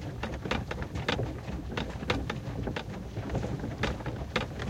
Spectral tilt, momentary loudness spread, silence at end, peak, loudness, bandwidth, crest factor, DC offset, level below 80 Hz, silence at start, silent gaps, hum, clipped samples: -6 dB/octave; 5 LU; 0 s; -12 dBFS; -35 LUFS; 16 kHz; 22 dB; under 0.1%; -42 dBFS; 0 s; none; none; under 0.1%